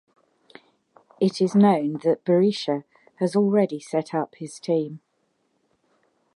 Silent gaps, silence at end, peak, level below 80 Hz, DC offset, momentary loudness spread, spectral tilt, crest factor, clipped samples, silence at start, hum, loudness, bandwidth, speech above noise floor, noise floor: none; 1.4 s; -6 dBFS; -76 dBFS; under 0.1%; 12 LU; -7 dB/octave; 18 dB; under 0.1%; 1.2 s; none; -23 LUFS; 11 kHz; 49 dB; -71 dBFS